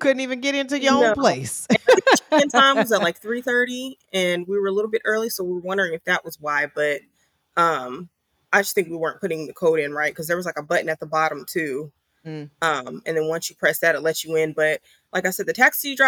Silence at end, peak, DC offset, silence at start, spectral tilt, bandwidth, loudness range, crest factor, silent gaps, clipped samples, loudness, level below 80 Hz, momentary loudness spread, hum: 0 s; -2 dBFS; under 0.1%; 0 s; -3.5 dB/octave; over 20 kHz; 6 LU; 20 dB; none; under 0.1%; -21 LUFS; -66 dBFS; 11 LU; none